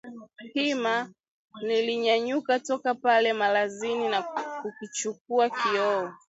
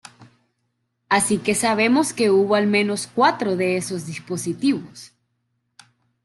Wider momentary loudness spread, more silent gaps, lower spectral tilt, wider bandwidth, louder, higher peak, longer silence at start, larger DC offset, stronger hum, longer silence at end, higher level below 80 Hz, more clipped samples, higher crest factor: about the same, 12 LU vs 10 LU; first, 1.28-1.48 s, 5.21-5.25 s vs none; second, -2.5 dB/octave vs -4 dB/octave; second, 8 kHz vs 12.5 kHz; second, -27 LUFS vs -20 LUFS; second, -10 dBFS vs -4 dBFS; second, 0.05 s vs 0.2 s; neither; neither; second, 0.15 s vs 1.2 s; second, -80 dBFS vs -64 dBFS; neither; about the same, 18 dB vs 18 dB